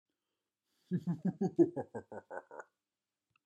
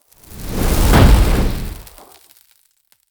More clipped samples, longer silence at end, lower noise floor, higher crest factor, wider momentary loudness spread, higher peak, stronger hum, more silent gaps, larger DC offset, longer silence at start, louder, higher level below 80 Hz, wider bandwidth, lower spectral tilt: neither; second, 0.85 s vs 1.3 s; first, under -90 dBFS vs -59 dBFS; first, 22 dB vs 16 dB; second, 18 LU vs 21 LU; second, -16 dBFS vs 0 dBFS; neither; neither; neither; first, 0.9 s vs 0.3 s; second, -35 LUFS vs -15 LUFS; second, -86 dBFS vs -18 dBFS; second, 8.2 kHz vs over 20 kHz; first, -10 dB/octave vs -5.5 dB/octave